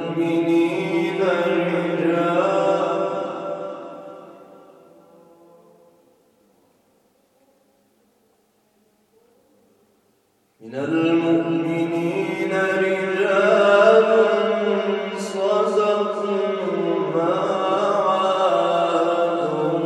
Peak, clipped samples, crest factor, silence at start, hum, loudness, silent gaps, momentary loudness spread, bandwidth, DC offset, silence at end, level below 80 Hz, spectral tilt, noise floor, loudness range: -2 dBFS; under 0.1%; 20 dB; 0 s; none; -20 LUFS; none; 10 LU; 12 kHz; under 0.1%; 0 s; -78 dBFS; -6 dB/octave; -64 dBFS; 10 LU